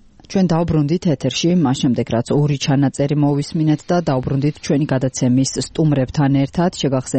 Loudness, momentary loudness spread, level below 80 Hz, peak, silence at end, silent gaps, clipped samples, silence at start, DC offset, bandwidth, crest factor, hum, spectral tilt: -17 LUFS; 3 LU; -44 dBFS; -6 dBFS; 0 s; none; under 0.1%; 0.3 s; 0.2%; 8.8 kHz; 10 dB; none; -6.5 dB/octave